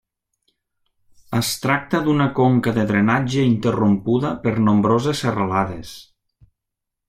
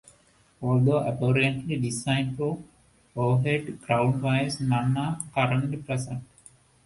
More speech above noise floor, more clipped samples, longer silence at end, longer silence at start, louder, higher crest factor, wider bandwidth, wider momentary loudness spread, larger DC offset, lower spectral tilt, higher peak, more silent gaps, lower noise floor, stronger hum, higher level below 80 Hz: first, 63 dB vs 35 dB; neither; first, 1.05 s vs 0.6 s; first, 1.3 s vs 0.6 s; first, -19 LUFS vs -26 LUFS; about the same, 16 dB vs 18 dB; first, 15.5 kHz vs 11.5 kHz; about the same, 6 LU vs 8 LU; neither; about the same, -6 dB/octave vs -6 dB/octave; first, -4 dBFS vs -8 dBFS; neither; first, -82 dBFS vs -60 dBFS; neither; first, -52 dBFS vs -58 dBFS